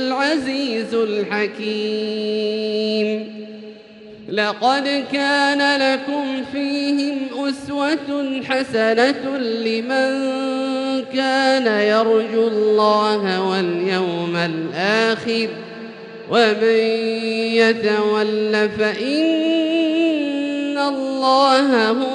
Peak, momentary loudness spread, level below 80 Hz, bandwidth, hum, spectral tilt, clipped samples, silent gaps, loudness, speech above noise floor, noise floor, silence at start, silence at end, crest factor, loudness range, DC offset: -2 dBFS; 8 LU; -64 dBFS; 11 kHz; none; -4.5 dB/octave; under 0.1%; none; -19 LUFS; 22 dB; -40 dBFS; 0 s; 0 s; 16 dB; 4 LU; under 0.1%